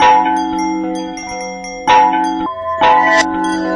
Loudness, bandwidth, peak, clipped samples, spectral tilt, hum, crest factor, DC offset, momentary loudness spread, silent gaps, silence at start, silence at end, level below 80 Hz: -14 LUFS; 10.5 kHz; 0 dBFS; under 0.1%; -3.5 dB/octave; none; 14 dB; under 0.1%; 13 LU; none; 0 s; 0 s; -46 dBFS